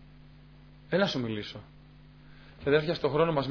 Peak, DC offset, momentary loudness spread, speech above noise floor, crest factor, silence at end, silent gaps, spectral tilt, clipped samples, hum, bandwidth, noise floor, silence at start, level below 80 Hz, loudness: -12 dBFS; under 0.1%; 12 LU; 25 dB; 20 dB; 0 s; none; -4.5 dB/octave; under 0.1%; none; 5.4 kHz; -53 dBFS; 0 s; -56 dBFS; -29 LUFS